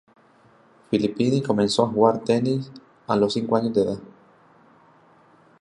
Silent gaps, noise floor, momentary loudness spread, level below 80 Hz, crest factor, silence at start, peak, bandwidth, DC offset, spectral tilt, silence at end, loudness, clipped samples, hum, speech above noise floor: none; -56 dBFS; 9 LU; -60 dBFS; 20 dB; 0.9 s; -4 dBFS; 11 kHz; under 0.1%; -6.5 dB/octave; 1.55 s; -22 LUFS; under 0.1%; none; 34 dB